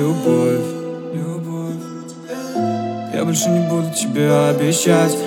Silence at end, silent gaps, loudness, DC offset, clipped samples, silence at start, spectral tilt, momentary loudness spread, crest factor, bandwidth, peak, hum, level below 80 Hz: 0 s; none; -18 LUFS; under 0.1%; under 0.1%; 0 s; -5 dB/octave; 13 LU; 18 dB; 17.5 kHz; 0 dBFS; none; -78 dBFS